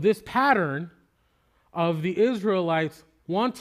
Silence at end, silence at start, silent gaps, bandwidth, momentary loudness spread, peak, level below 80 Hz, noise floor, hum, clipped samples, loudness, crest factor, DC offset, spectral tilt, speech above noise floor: 0 s; 0 s; none; 15.5 kHz; 12 LU; -6 dBFS; -64 dBFS; -67 dBFS; none; under 0.1%; -25 LUFS; 18 dB; under 0.1%; -6.5 dB/octave; 43 dB